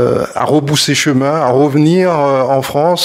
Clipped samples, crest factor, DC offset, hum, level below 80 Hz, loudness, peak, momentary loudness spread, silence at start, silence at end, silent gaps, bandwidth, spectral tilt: under 0.1%; 12 dB; under 0.1%; none; -50 dBFS; -12 LUFS; 0 dBFS; 3 LU; 0 s; 0 s; none; 16 kHz; -5 dB/octave